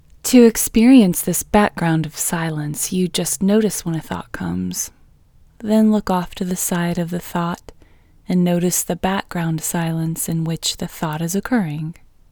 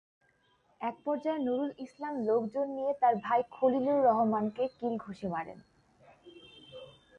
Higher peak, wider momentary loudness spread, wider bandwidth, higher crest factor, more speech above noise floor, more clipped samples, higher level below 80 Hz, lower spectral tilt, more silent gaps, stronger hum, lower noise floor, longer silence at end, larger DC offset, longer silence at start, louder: first, 0 dBFS vs -14 dBFS; about the same, 13 LU vs 14 LU; first, over 20 kHz vs 7.2 kHz; about the same, 18 dB vs 18 dB; second, 32 dB vs 39 dB; neither; first, -44 dBFS vs -72 dBFS; second, -5 dB/octave vs -8 dB/octave; neither; neither; second, -50 dBFS vs -70 dBFS; about the same, 0.4 s vs 0.3 s; neither; second, 0.25 s vs 0.8 s; first, -18 LUFS vs -31 LUFS